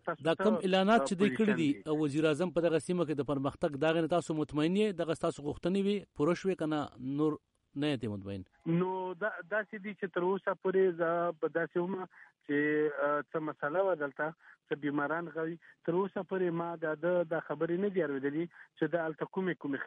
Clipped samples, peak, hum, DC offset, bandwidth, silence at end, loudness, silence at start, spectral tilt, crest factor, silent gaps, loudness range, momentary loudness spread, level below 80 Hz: under 0.1%; -18 dBFS; none; under 0.1%; 11.5 kHz; 0 s; -33 LUFS; 0.05 s; -6.5 dB/octave; 16 dB; none; 4 LU; 9 LU; -68 dBFS